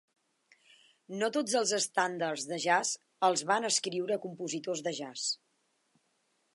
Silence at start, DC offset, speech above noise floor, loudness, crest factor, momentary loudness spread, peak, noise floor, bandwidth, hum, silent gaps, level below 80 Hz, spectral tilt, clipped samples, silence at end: 1.1 s; under 0.1%; 44 dB; -31 LUFS; 20 dB; 8 LU; -14 dBFS; -76 dBFS; 11.5 kHz; none; none; -88 dBFS; -2 dB/octave; under 0.1%; 1.2 s